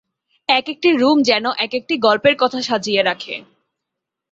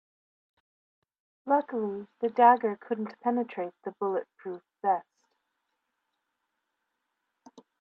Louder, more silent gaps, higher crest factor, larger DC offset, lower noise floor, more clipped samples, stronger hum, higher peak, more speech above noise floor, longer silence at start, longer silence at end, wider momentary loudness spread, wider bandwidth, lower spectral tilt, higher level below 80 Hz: first, -17 LUFS vs -28 LUFS; neither; second, 16 dB vs 24 dB; neither; about the same, -81 dBFS vs -82 dBFS; neither; neither; first, -2 dBFS vs -8 dBFS; first, 65 dB vs 54 dB; second, 0.5 s vs 1.45 s; second, 0.9 s vs 2.8 s; second, 11 LU vs 17 LU; first, 8 kHz vs 6.4 kHz; second, -3.5 dB/octave vs -8 dB/octave; first, -62 dBFS vs -86 dBFS